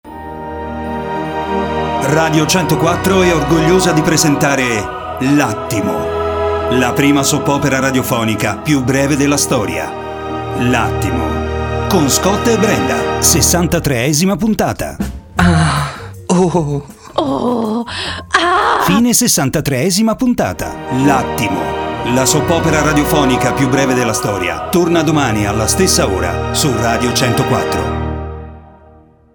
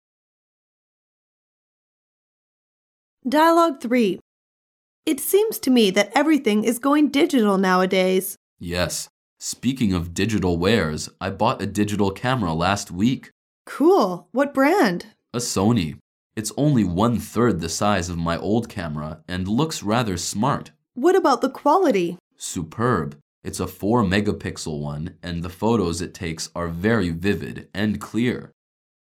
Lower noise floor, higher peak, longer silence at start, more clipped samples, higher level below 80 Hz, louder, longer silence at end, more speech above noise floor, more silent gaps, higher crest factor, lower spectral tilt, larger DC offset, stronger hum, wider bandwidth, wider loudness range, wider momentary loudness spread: second, -44 dBFS vs under -90 dBFS; first, 0 dBFS vs -4 dBFS; second, 0.05 s vs 3.25 s; neither; first, -32 dBFS vs -50 dBFS; first, -14 LUFS vs -21 LUFS; first, 0.7 s vs 0.55 s; second, 31 dB vs over 69 dB; second, none vs 4.21-5.03 s, 8.37-8.57 s, 9.10-9.37 s, 13.32-13.65 s, 16.01-16.30 s, 22.20-22.31 s, 23.22-23.42 s; about the same, 14 dB vs 18 dB; about the same, -4.5 dB/octave vs -5 dB/octave; neither; neither; first, over 20 kHz vs 17.5 kHz; about the same, 3 LU vs 5 LU; second, 9 LU vs 12 LU